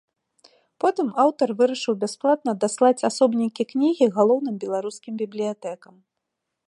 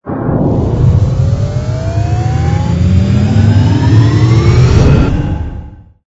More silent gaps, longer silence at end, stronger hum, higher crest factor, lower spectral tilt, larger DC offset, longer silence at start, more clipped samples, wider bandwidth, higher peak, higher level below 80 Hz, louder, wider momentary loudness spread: neither; first, 0.95 s vs 0.25 s; neither; first, 18 dB vs 10 dB; second, -5 dB/octave vs -8 dB/octave; neither; first, 0.85 s vs 0.05 s; second, under 0.1% vs 0.4%; first, 11.5 kHz vs 8 kHz; second, -6 dBFS vs 0 dBFS; second, -80 dBFS vs -20 dBFS; second, -22 LUFS vs -11 LUFS; first, 11 LU vs 8 LU